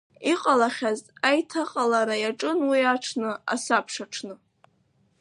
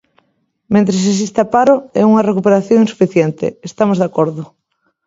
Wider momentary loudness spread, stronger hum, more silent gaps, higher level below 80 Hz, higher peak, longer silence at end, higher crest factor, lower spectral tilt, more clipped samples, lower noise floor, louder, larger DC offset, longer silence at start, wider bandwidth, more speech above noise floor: first, 10 LU vs 7 LU; neither; neither; second, -80 dBFS vs -56 dBFS; second, -6 dBFS vs 0 dBFS; first, 0.85 s vs 0.6 s; first, 20 dB vs 14 dB; second, -2.5 dB/octave vs -6.5 dB/octave; neither; about the same, -66 dBFS vs -64 dBFS; second, -25 LUFS vs -13 LUFS; neither; second, 0.2 s vs 0.7 s; first, 11.5 kHz vs 7.8 kHz; second, 42 dB vs 51 dB